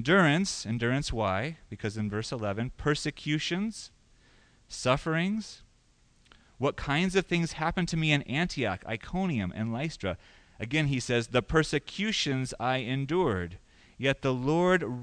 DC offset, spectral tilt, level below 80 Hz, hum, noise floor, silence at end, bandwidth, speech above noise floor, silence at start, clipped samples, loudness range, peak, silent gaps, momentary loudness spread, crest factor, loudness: under 0.1%; -5 dB/octave; -50 dBFS; none; -64 dBFS; 0 s; 10.5 kHz; 35 dB; 0 s; under 0.1%; 4 LU; -10 dBFS; none; 10 LU; 20 dB; -29 LUFS